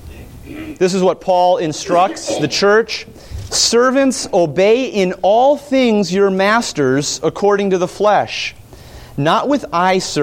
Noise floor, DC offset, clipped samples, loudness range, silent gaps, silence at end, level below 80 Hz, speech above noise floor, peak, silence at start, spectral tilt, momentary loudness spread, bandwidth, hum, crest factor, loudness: -36 dBFS; under 0.1%; under 0.1%; 3 LU; none; 0 s; -44 dBFS; 22 dB; 0 dBFS; 0 s; -4 dB/octave; 9 LU; 16.5 kHz; none; 14 dB; -14 LUFS